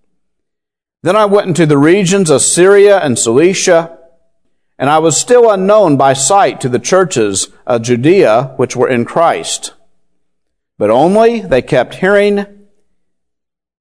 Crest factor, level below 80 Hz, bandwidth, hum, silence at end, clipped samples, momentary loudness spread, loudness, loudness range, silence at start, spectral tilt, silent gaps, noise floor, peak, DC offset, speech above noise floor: 10 dB; -48 dBFS; 11 kHz; none; 1.35 s; 0.8%; 9 LU; -10 LUFS; 4 LU; 1.05 s; -4.5 dB/octave; none; -79 dBFS; 0 dBFS; 0.4%; 70 dB